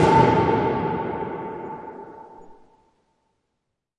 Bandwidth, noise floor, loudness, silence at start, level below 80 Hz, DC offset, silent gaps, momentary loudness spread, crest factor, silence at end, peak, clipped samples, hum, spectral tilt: 10.5 kHz; -79 dBFS; -22 LUFS; 0 s; -50 dBFS; under 0.1%; none; 24 LU; 20 dB; 1.45 s; -4 dBFS; under 0.1%; none; -7.5 dB/octave